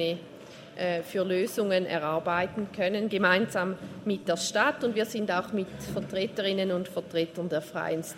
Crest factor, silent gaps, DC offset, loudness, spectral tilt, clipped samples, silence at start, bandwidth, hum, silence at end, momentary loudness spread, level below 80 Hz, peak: 20 dB; none; under 0.1%; -29 LUFS; -4.5 dB/octave; under 0.1%; 0 s; 16 kHz; none; 0 s; 8 LU; -66 dBFS; -8 dBFS